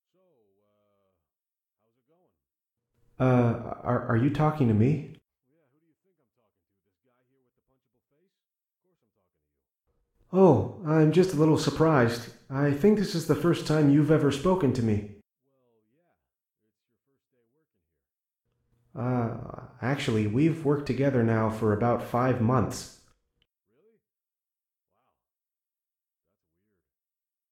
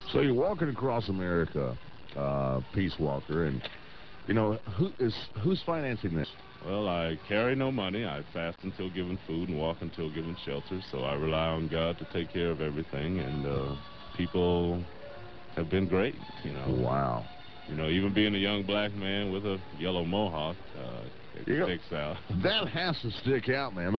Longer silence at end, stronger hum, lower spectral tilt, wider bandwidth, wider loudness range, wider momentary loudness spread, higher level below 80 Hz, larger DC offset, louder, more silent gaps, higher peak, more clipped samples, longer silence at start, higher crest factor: first, 4.65 s vs 0 s; neither; about the same, -7.5 dB/octave vs -8.5 dB/octave; first, 15 kHz vs 6 kHz; first, 11 LU vs 3 LU; about the same, 11 LU vs 12 LU; second, -58 dBFS vs -48 dBFS; second, under 0.1% vs 0.5%; first, -25 LUFS vs -32 LUFS; neither; first, -8 dBFS vs -14 dBFS; neither; first, 3.2 s vs 0 s; about the same, 20 dB vs 18 dB